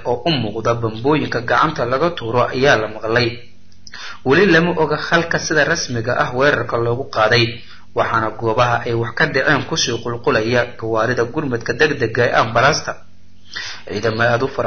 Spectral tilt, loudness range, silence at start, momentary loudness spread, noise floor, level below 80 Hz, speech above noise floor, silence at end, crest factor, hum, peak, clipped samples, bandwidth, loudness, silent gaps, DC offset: -4.5 dB/octave; 2 LU; 0 s; 8 LU; -42 dBFS; -44 dBFS; 25 dB; 0 s; 16 dB; none; -2 dBFS; under 0.1%; 6.8 kHz; -17 LUFS; none; 2%